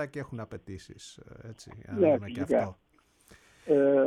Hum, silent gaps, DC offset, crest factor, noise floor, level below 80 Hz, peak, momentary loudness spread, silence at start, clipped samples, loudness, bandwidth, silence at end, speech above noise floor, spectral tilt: none; none; under 0.1%; 18 dB; -60 dBFS; -62 dBFS; -12 dBFS; 22 LU; 0 s; under 0.1%; -28 LUFS; 11.5 kHz; 0 s; 32 dB; -7 dB/octave